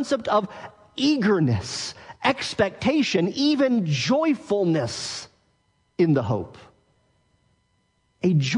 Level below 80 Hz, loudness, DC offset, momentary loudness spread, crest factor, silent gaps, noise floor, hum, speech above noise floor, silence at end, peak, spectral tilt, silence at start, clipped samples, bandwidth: -60 dBFS; -23 LUFS; under 0.1%; 12 LU; 20 dB; none; -68 dBFS; none; 46 dB; 0 s; -4 dBFS; -5.5 dB/octave; 0 s; under 0.1%; 10.5 kHz